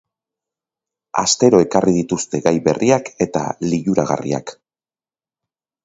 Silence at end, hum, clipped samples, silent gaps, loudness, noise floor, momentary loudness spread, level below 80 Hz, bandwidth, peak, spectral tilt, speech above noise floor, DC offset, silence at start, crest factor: 1.3 s; none; under 0.1%; none; -17 LUFS; under -90 dBFS; 10 LU; -52 dBFS; 8 kHz; 0 dBFS; -5 dB/octave; over 73 dB; under 0.1%; 1.15 s; 18 dB